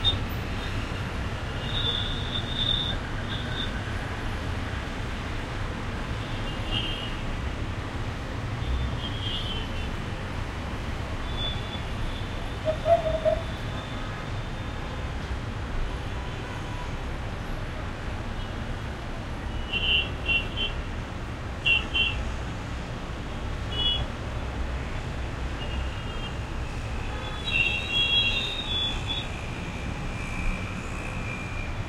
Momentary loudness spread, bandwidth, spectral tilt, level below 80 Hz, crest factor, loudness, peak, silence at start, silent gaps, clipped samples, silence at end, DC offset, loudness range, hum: 11 LU; 15 kHz; -5 dB/octave; -34 dBFS; 20 dB; -29 LUFS; -10 dBFS; 0 s; none; under 0.1%; 0 s; under 0.1%; 8 LU; none